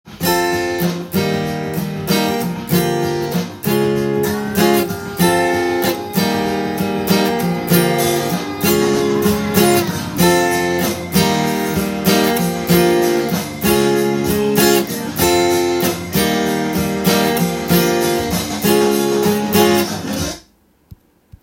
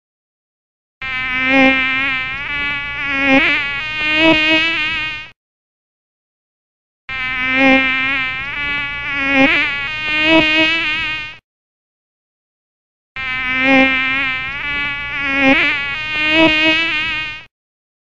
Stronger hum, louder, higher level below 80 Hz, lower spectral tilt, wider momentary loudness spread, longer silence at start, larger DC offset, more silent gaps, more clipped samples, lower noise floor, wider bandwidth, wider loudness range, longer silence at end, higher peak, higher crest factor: neither; about the same, -16 LUFS vs -14 LUFS; about the same, -44 dBFS vs -42 dBFS; about the same, -4.5 dB/octave vs -4 dB/octave; second, 6 LU vs 10 LU; second, 0.05 s vs 1 s; neither; second, none vs 5.36-7.08 s, 11.44-13.15 s; neither; second, -53 dBFS vs under -90 dBFS; first, 17 kHz vs 8 kHz; about the same, 2 LU vs 4 LU; about the same, 0.5 s vs 0.55 s; about the same, 0 dBFS vs 0 dBFS; about the same, 16 dB vs 16 dB